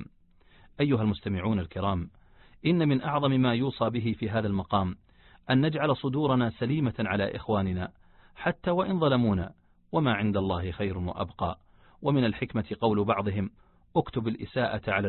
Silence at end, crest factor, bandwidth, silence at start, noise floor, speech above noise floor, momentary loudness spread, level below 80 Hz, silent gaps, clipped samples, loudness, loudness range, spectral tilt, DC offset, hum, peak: 0 s; 18 dB; 4.3 kHz; 0 s; -59 dBFS; 32 dB; 9 LU; -48 dBFS; none; under 0.1%; -28 LUFS; 2 LU; -11 dB/octave; under 0.1%; none; -10 dBFS